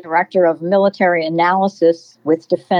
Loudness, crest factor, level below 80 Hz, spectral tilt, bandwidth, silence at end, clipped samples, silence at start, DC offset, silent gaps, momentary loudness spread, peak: -16 LUFS; 12 dB; -88 dBFS; -7 dB/octave; 7.2 kHz; 0 s; under 0.1%; 0.05 s; under 0.1%; none; 5 LU; -4 dBFS